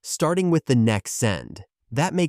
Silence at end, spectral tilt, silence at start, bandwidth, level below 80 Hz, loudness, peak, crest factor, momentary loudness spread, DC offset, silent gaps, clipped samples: 0 s; -5.5 dB/octave; 0.05 s; 15.5 kHz; -54 dBFS; -22 LUFS; -8 dBFS; 14 dB; 11 LU; under 0.1%; none; under 0.1%